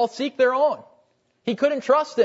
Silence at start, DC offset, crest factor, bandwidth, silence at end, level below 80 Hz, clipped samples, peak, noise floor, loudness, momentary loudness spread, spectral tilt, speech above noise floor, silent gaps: 0 s; under 0.1%; 16 dB; 8 kHz; 0 s; -78 dBFS; under 0.1%; -6 dBFS; -64 dBFS; -22 LUFS; 12 LU; -4.5 dB/octave; 43 dB; none